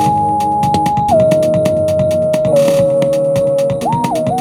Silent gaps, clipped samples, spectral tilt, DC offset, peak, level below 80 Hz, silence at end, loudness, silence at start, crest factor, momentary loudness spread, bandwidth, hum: none; under 0.1%; -6.5 dB/octave; under 0.1%; 0 dBFS; -42 dBFS; 0 s; -13 LUFS; 0 s; 12 dB; 4 LU; 16.5 kHz; none